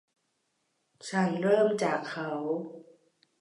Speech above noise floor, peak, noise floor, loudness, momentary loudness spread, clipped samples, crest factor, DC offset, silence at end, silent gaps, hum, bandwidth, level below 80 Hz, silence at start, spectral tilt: 49 dB; -12 dBFS; -77 dBFS; -29 LUFS; 12 LU; under 0.1%; 18 dB; under 0.1%; 0.6 s; none; none; 11.5 kHz; -84 dBFS; 1.05 s; -6 dB/octave